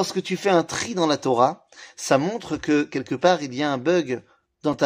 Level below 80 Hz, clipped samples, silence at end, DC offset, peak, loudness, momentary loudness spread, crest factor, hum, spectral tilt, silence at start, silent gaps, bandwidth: -60 dBFS; under 0.1%; 0 s; under 0.1%; -4 dBFS; -23 LUFS; 9 LU; 18 dB; none; -4.5 dB/octave; 0 s; none; 15.5 kHz